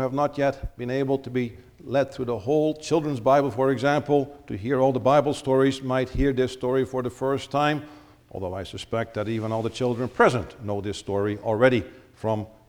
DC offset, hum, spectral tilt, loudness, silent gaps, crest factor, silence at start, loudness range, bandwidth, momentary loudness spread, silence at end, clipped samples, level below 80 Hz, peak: under 0.1%; none; -6.5 dB/octave; -25 LUFS; none; 18 dB; 0 s; 5 LU; 19.5 kHz; 12 LU; 0.2 s; under 0.1%; -44 dBFS; -6 dBFS